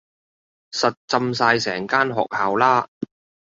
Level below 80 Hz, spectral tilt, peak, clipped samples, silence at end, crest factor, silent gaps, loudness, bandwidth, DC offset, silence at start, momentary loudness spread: -64 dBFS; -4 dB/octave; -2 dBFS; under 0.1%; 0.55 s; 20 dB; 0.97-1.08 s, 2.88-3.01 s; -20 LUFS; 7.8 kHz; under 0.1%; 0.7 s; 13 LU